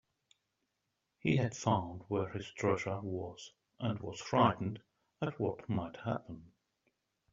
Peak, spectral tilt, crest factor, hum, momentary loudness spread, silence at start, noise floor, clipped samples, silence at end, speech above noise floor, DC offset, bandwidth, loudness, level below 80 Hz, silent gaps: -14 dBFS; -6 dB/octave; 24 dB; none; 14 LU; 1.25 s; -85 dBFS; under 0.1%; 0.85 s; 50 dB; under 0.1%; 7.6 kHz; -36 LUFS; -68 dBFS; none